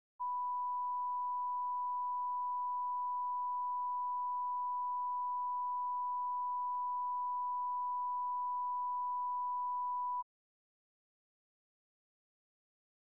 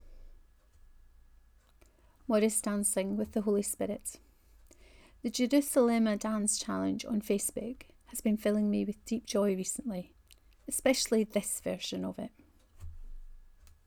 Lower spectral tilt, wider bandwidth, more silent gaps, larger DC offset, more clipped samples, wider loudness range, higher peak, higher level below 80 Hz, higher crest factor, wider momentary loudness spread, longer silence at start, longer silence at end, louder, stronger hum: second, 14 dB/octave vs -4 dB/octave; second, 1.1 kHz vs over 20 kHz; neither; neither; neither; about the same, 4 LU vs 3 LU; second, -34 dBFS vs -12 dBFS; second, under -90 dBFS vs -56 dBFS; second, 4 dB vs 20 dB; second, 0 LU vs 16 LU; first, 0.2 s vs 0.05 s; first, 2.8 s vs 0.45 s; second, -38 LUFS vs -32 LUFS; neither